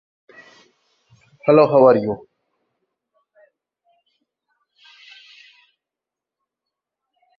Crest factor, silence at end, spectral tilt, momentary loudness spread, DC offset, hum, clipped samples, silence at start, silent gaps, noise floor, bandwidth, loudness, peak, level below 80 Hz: 22 dB; 5.2 s; -9 dB/octave; 15 LU; under 0.1%; none; under 0.1%; 1.45 s; none; -87 dBFS; 6 kHz; -15 LUFS; -2 dBFS; -66 dBFS